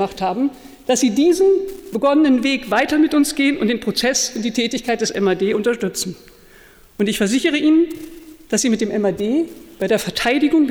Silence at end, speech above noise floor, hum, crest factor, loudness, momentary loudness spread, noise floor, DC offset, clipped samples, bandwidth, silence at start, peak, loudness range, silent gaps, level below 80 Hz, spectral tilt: 0 s; 29 dB; none; 12 dB; -18 LUFS; 8 LU; -46 dBFS; under 0.1%; under 0.1%; 19.5 kHz; 0 s; -6 dBFS; 4 LU; none; -50 dBFS; -3.5 dB/octave